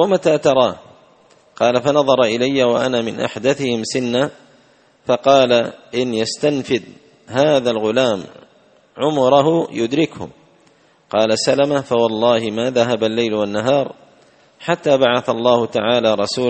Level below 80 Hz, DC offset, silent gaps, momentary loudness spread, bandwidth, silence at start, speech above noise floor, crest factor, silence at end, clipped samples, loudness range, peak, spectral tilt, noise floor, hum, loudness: -58 dBFS; under 0.1%; none; 8 LU; 8.8 kHz; 0 s; 37 dB; 18 dB; 0 s; under 0.1%; 2 LU; 0 dBFS; -5 dB/octave; -53 dBFS; none; -17 LUFS